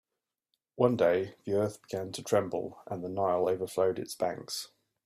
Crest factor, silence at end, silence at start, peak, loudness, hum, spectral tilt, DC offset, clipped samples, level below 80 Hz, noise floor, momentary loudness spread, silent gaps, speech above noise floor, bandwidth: 20 dB; 0.4 s; 0.75 s; -12 dBFS; -31 LUFS; none; -5.5 dB/octave; under 0.1%; under 0.1%; -72 dBFS; -83 dBFS; 11 LU; none; 52 dB; 15.5 kHz